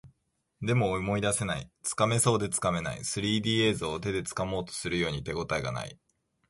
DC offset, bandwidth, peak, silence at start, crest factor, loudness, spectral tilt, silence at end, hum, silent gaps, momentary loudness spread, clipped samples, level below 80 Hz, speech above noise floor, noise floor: under 0.1%; 12 kHz; -12 dBFS; 0.05 s; 18 dB; -29 LUFS; -4 dB/octave; 0.55 s; none; none; 9 LU; under 0.1%; -52 dBFS; 46 dB; -76 dBFS